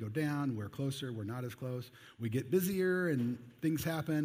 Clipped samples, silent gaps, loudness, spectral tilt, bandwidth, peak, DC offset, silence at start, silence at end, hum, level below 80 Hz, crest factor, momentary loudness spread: under 0.1%; none; -36 LUFS; -6.5 dB/octave; 16 kHz; -20 dBFS; under 0.1%; 0 s; 0 s; none; -70 dBFS; 16 dB; 10 LU